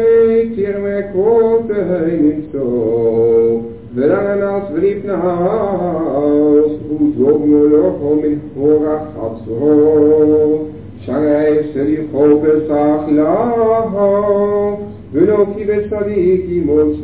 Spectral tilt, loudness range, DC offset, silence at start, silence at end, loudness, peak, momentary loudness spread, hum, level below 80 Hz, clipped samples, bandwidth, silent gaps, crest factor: -12.5 dB/octave; 2 LU; 0.6%; 0 s; 0 s; -14 LUFS; 0 dBFS; 8 LU; none; -42 dBFS; under 0.1%; 4 kHz; none; 12 dB